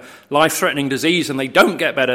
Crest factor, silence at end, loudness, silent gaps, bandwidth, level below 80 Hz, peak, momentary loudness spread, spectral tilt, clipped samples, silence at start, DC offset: 18 dB; 0 s; -16 LUFS; none; 16.5 kHz; -58 dBFS; 0 dBFS; 4 LU; -3.5 dB/octave; under 0.1%; 0 s; under 0.1%